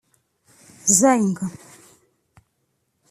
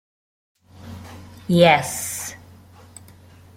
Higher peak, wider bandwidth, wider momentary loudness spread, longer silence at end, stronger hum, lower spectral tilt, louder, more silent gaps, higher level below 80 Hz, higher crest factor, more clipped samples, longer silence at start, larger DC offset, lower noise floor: about the same, 0 dBFS vs -2 dBFS; about the same, 15 kHz vs 16.5 kHz; second, 15 LU vs 25 LU; first, 1.6 s vs 1.2 s; neither; about the same, -4 dB/octave vs -4.5 dB/octave; about the same, -18 LUFS vs -18 LUFS; neither; second, -66 dBFS vs -58 dBFS; about the same, 24 dB vs 22 dB; neither; about the same, 0.85 s vs 0.8 s; neither; first, -71 dBFS vs -47 dBFS